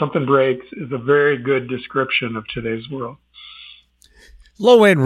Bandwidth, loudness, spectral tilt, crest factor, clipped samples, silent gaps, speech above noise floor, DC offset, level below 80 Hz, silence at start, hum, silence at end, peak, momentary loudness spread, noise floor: 14 kHz; -18 LUFS; -6.5 dB/octave; 18 dB; under 0.1%; none; 34 dB; under 0.1%; -54 dBFS; 0 s; 60 Hz at -50 dBFS; 0 s; 0 dBFS; 20 LU; -51 dBFS